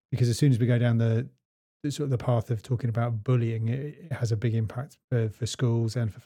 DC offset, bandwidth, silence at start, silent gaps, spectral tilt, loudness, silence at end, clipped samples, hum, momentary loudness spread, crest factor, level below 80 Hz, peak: under 0.1%; 11 kHz; 0.1 s; 1.45-1.80 s, 5.04-5.08 s; -7 dB/octave; -27 LUFS; 0.05 s; under 0.1%; none; 10 LU; 16 dB; -62 dBFS; -12 dBFS